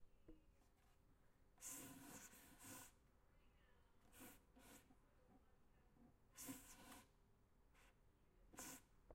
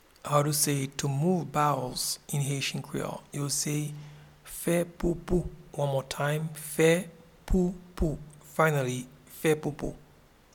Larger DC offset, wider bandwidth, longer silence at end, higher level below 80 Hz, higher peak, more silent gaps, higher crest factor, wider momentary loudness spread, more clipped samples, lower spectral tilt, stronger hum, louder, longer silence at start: neither; second, 16 kHz vs 18.5 kHz; second, 0 s vs 0.5 s; second, -76 dBFS vs -44 dBFS; second, -42 dBFS vs -10 dBFS; neither; about the same, 24 dB vs 20 dB; about the same, 12 LU vs 13 LU; neither; second, -2.5 dB/octave vs -4.5 dB/octave; neither; second, -61 LUFS vs -29 LUFS; second, 0 s vs 0.25 s